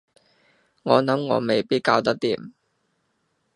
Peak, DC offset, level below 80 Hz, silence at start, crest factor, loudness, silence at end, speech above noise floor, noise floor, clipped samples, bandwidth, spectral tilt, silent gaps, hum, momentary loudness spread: -2 dBFS; under 0.1%; -68 dBFS; 0.85 s; 24 dB; -22 LUFS; 1.05 s; 50 dB; -71 dBFS; under 0.1%; 11 kHz; -6 dB/octave; none; none; 8 LU